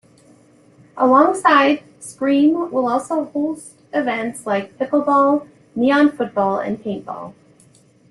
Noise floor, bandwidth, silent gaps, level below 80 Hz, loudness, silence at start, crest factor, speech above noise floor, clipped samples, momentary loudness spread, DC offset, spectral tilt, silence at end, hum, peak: -52 dBFS; 12 kHz; none; -64 dBFS; -18 LUFS; 0.95 s; 18 dB; 35 dB; under 0.1%; 15 LU; under 0.1%; -5 dB/octave; 0.8 s; none; 0 dBFS